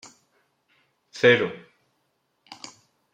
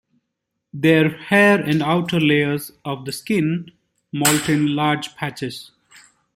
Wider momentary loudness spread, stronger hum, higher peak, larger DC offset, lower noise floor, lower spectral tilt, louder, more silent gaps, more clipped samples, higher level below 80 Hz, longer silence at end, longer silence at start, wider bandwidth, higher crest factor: first, 25 LU vs 14 LU; neither; second, -6 dBFS vs -2 dBFS; neither; second, -73 dBFS vs -78 dBFS; about the same, -4.5 dB/octave vs -4.5 dB/octave; about the same, -21 LUFS vs -19 LUFS; neither; neither; second, -74 dBFS vs -58 dBFS; first, 1.55 s vs 0.75 s; first, 1.15 s vs 0.75 s; second, 9.2 kHz vs 16.5 kHz; about the same, 22 dB vs 18 dB